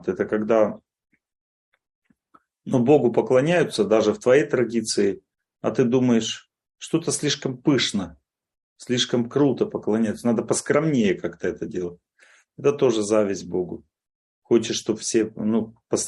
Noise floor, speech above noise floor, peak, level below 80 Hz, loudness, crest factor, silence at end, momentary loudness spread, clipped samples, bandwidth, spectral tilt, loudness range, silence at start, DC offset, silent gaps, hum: -61 dBFS; 39 dB; -4 dBFS; -64 dBFS; -22 LUFS; 18 dB; 0 s; 11 LU; under 0.1%; 12 kHz; -5 dB/octave; 4 LU; 0.05 s; under 0.1%; 1.41-1.72 s, 1.95-2.02 s, 8.63-8.76 s, 14.15-14.42 s; none